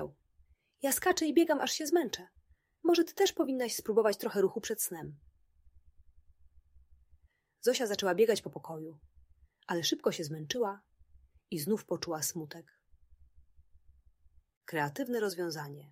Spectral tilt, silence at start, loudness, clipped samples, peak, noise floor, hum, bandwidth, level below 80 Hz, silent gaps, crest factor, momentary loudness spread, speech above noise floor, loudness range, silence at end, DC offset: -3.5 dB/octave; 0 s; -32 LUFS; under 0.1%; -14 dBFS; -68 dBFS; none; 16 kHz; -68 dBFS; 14.57-14.61 s; 20 dB; 16 LU; 36 dB; 9 LU; 0.05 s; under 0.1%